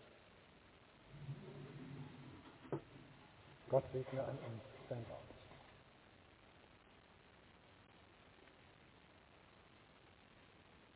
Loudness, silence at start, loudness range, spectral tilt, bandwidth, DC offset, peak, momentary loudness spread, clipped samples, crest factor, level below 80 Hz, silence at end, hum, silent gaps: -48 LUFS; 0 s; 19 LU; -6.5 dB/octave; 4 kHz; under 0.1%; -22 dBFS; 20 LU; under 0.1%; 28 dB; -74 dBFS; 0 s; none; none